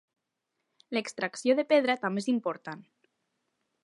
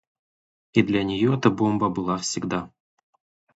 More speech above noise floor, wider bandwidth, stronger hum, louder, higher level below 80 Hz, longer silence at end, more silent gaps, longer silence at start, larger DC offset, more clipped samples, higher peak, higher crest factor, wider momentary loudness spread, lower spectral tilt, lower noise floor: second, 55 dB vs over 68 dB; first, 11.5 kHz vs 8 kHz; neither; second, -29 LUFS vs -23 LUFS; second, -86 dBFS vs -56 dBFS; first, 1.05 s vs 0.9 s; neither; first, 0.9 s vs 0.75 s; neither; neither; second, -12 dBFS vs -4 dBFS; about the same, 20 dB vs 22 dB; first, 16 LU vs 8 LU; about the same, -4.5 dB/octave vs -5.5 dB/octave; second, -83 dBFS vs under -90 dBFS